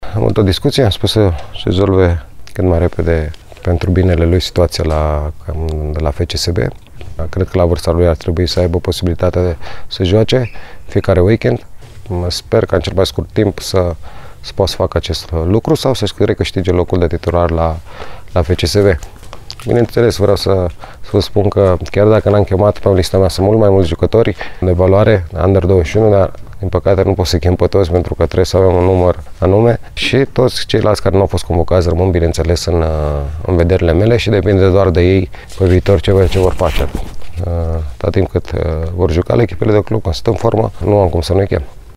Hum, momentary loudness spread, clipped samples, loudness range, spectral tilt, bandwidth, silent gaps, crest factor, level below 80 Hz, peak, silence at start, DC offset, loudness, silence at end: none; 9 LU; under 0.1%; 4 LU; -6.5 dB/octave; 14 kHz; none; 12 dB; -26 dBFS; 0 dBFS; 0 s; under 0.1%; -13 LUFS; 0.05 s